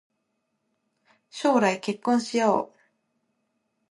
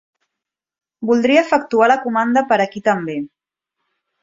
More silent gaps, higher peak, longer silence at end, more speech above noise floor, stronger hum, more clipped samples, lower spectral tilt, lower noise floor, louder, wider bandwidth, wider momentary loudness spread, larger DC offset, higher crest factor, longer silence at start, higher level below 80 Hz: neither; second, -8 dBFS vs -2 dBFS; first, 1.25 s vs 0.95 s; second, 53 dB vs 68 dB; neither; neither; about the same, -4.5 dB/octave vs -5.5 dB/octave; second, -77 dBFS vs -83 dBFS; second, -24 LUFS vs -16 LUFS; first, 11.5 kHz vs 7.6 kHz; about the same, 11 LU vs 13 LU; neither; about the same, 20 dB vs 18 dB; first, 1.35 s vs 1 s; second, -78 dBFS vs -64 dBFS